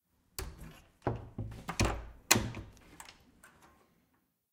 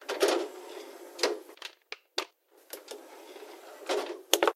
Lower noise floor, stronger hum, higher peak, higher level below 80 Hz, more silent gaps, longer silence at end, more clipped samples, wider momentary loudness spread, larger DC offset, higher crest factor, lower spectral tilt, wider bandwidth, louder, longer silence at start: first, -76 dBFS vs -57 dBFS; neither; second, -6 dBFS vs 0 dBFS; first, -48 dBFS vs -86 dBFS; neither; first, 1.05 s vs 0 s; neither; first, 24 LU vs 19 LU; neither; about the same, 34 dB vs 34 dB; first, -3 dB/octave vs 1 dB/octave; about the same, 16.5 kHz vs 16 kHz; about the same, -35 LUFS vs -33 LUFS; first, 0.4 s vs 0 s